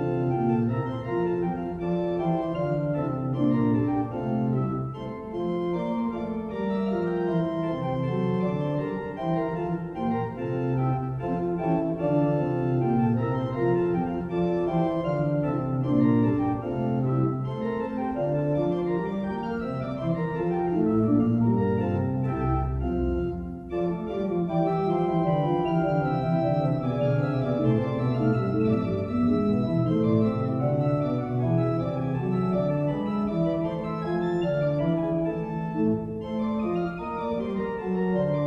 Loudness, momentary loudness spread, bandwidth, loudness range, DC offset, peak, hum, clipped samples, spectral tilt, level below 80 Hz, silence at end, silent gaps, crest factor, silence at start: -26 LUFS; 6 LU; 6 kHz; 3 LU; under 0.1%; -10 dBFS; none; under 0.1%; -10.5 dB/octave; -46 dBFS; 0 s; none; 16 dB; 0 s